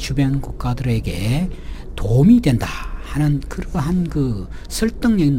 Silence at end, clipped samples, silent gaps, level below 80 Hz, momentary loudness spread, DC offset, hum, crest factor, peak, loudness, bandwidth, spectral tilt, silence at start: 0 s; under 0.1%; none; -28 dBFS; 14 LU; under 0.1%; none; 16 dB; -2 dBFS; -19 LUFS; 16 kHz; -7 dB/octave; 0 s